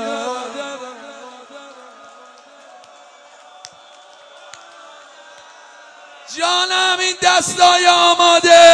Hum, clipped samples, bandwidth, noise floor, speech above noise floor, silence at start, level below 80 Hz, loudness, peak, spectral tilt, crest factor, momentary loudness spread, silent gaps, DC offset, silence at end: none; under 0.1%; 11 kHz; -44 dBFS; 32 dB; 0 s; -64 dBFS; -12 LUFS; 0 dBFS; -0.5 dB/octave; 16 dB; 25 LU; none; under 0.1%; 0 s